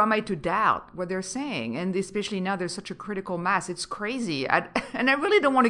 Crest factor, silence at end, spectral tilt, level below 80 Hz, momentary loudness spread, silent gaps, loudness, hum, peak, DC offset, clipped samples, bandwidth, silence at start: 20 dB; 0 s; -4.5 dB/octave; -60 dBFS; 10 LU; none; -27 LUFS; none; -6 dBFS; under 0.1%; under 0.1%; 11.5 kHz; 0 s